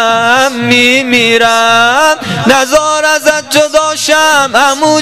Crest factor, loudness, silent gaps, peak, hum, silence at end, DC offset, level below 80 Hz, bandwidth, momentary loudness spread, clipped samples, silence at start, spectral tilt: 8 dB; -7 LUFS; none; 0 dBFS; none; 0 s; 0.9%; -44 dBFS; 16.5 kHz; 3 LU; 0.6%; 0 s; -2.5 dB/octave